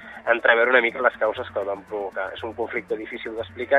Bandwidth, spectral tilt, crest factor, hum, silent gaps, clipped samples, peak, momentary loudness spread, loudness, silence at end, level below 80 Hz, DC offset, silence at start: 7.8 kHz; -5.5 dB/octave; 20 dB; none; none; under 0.1%; -2 dBFS; 14 LU; -23 LUFS; 0 s; -60 dBFS; under 0.1%; 0 s